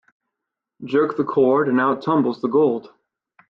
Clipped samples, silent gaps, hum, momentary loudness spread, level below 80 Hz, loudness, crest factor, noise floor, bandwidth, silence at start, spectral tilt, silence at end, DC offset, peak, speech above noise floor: under 0.1%; none; none; 6 LU; -66 dBFS; -19 LUFS; 14 dB; -83 dBFS; 5.8 kHz; 0.8 s; -9 dB/octave; 0.65 s; under 0.1%; -6 dBFS; 65 dB